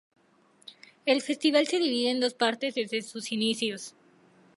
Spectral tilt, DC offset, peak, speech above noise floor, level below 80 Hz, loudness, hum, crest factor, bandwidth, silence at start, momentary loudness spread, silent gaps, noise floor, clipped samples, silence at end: -3 dB/octave; under 0.1%; -10 dBFS; 36 dB; -84 dBFS; -27 LUFS; none; 20 dB; 11.5 kHz; 0.7 s; 14 LU; none; -63 dBFS; under 0.1%; 0.65 s